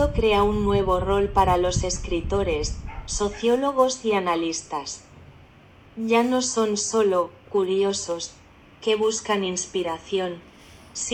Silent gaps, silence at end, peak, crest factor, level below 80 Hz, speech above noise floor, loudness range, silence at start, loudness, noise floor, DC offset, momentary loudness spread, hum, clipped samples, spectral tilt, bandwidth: none; 0 s; -6 dBFS; 18 dB; -38 dBFS; 28 dB; 3 LU; 0 s; -23 LUFS; -50 dBFS; under 0.1%; 11 LU; none; under 0.1%; -4 dB/octave; 17.5 kHz